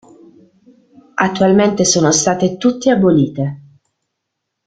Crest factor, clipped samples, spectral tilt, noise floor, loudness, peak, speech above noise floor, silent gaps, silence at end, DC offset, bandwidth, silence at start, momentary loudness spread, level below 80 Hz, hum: 16 dB; under 0.1%; -4.5 dB/octave; -76 dBFS; -14 LUFS; 0 dBFS; 63 dB; none; 1.1 s; under 0.1%; 9.6 kHz; 1.15 s; 9 LU; -52 dBFS; none